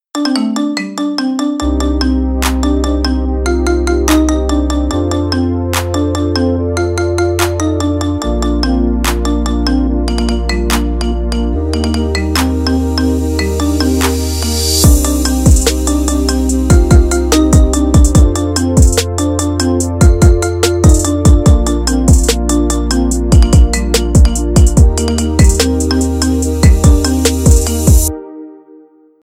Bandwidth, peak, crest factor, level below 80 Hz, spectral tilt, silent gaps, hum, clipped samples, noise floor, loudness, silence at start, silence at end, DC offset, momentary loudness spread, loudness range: 16 kHz; 0 dBFS; 10 dB; -14 dBFS; -5.5 dB/octave; none; none; 0.2%; -42 dBFS; -12 LUFS; 0.15 s; 0.65 s; under 0.1%; 6 LU; 4 LU